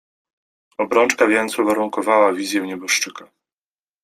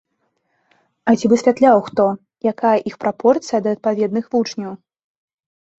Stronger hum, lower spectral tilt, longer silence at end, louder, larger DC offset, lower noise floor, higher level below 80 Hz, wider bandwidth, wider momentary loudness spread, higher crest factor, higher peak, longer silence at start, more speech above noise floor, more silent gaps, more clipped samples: neither; second, -2.5 dB/octave vs -6 dB/octave; second, 0.8 s vs 1.05 s; about the same, -18 LUFS vs -17 LUFS; neither; first, under -90 dBFS vs -69 dBFS; about the same, -66 dBFS vs -62 dBFS; first, 15.5 kHz vs 8 kHz; about the same, 9 LU vs 10 LU; about the same, 18 dB vs 16 dB; about the same, -2 dBFS vs -2 dBFS; second, 0.8 s vs 1.05 s; first, over 72 dB vs 53 dB; neither; neither